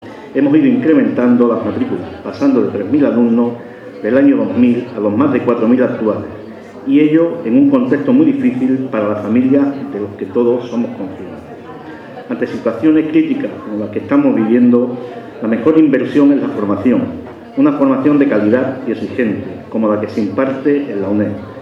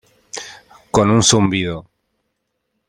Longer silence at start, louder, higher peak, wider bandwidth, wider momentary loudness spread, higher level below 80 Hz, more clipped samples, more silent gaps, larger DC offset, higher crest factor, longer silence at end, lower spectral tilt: second, 0 s vs 0.35 s; about the same, -14 LUFS vs -15 LUFS; about the same, 0 dBFS vs 0 dBFS; second, 6.2 kHz vs 16.5 kHz; second, 14 LU vs 20 LU; second, -56 dBFS vs -46 dBFS; neither; neither; neither; about the same, 14 dB vs 18 dB; second, 0 s vs 1.1 s; first, -9 dB/octave vs -4 dB/octave